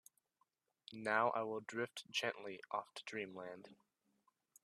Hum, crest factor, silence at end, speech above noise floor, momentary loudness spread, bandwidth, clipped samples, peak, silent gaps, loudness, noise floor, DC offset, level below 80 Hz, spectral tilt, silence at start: none; 24 dB; 0.9 s; 41 dB; 17 LU; 13.5 kHz; under 0.1%; -22 dBFS; none; -42 LUFS; -83 dBFS; under 0.1%; under -90 dBFS; -3.5 dB/octave; 0.9 s